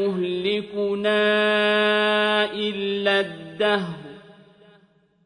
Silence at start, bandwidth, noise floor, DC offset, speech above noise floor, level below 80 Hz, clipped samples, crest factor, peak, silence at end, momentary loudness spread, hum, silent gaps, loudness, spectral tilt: 0 s; 10 kHz; -59 dBFS; under 0.1%; 37 dB; -66 dBFS; under 0.1%; 16 dB; -6 dBFS; 1.05 s; 7 LU; none; none; -21 LUFS; -5 dB/octave